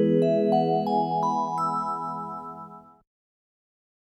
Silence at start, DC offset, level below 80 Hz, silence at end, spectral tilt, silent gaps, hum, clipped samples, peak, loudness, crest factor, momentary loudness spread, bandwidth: 0 s; under 0.1%; -72 dBFS; 1.4 s; -8 dB/octave; none; none; under 0.1%; -10 dBFS; -25 LUFS; 16 dB; 16 LU; 11.5 kHz